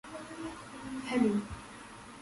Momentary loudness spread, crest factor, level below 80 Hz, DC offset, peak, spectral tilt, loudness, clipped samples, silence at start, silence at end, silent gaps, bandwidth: 18 LU; 20 dB; -58 dBFS; under 0.1%; -16 dBFS; -5.5 dB/octave; -35 LUFS; under 0.1%; 0.05 s; 0 s; none; 11.5 kHz